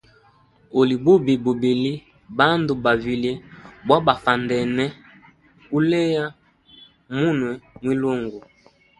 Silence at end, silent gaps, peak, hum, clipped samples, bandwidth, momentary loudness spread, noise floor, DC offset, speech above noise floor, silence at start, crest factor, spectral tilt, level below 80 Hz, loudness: 0.6 s; none; 0 dBFS; none; under 0.1%; 11 kHz; 14 LU; -56 dBFS; under 0.1%; 36 dB; 0.75 s; 22 dB; -7 dB/octave; -54 dBFS; -21 LUFS